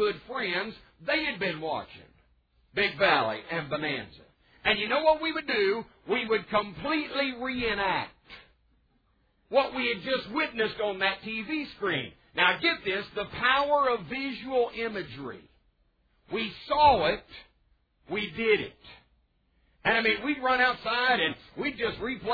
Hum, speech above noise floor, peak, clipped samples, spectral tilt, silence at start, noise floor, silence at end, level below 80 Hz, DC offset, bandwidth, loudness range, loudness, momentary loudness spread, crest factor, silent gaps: none; 41 dB; -8 dBFS; under 0.1%; -6.5 dB/octave; 0 s; -69 dBFS; 0 s; -58 dBFS; under 0.1%; 5 kHz; 3 LU; -28 LUFS; 12 LU; 22 dB; none